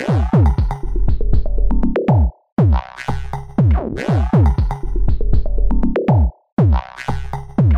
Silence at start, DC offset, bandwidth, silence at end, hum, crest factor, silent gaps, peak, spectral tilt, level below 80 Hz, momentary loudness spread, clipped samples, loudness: 0 s; under 0.1%; 7 kHz; 0 s; none; 14 dB; 2.52-2.57 s, 6.52-6.57 s; 0 dBFS; -9.5 dB/octave; -18 dBFS; 10 LU; under 0.1%; -18 LUFS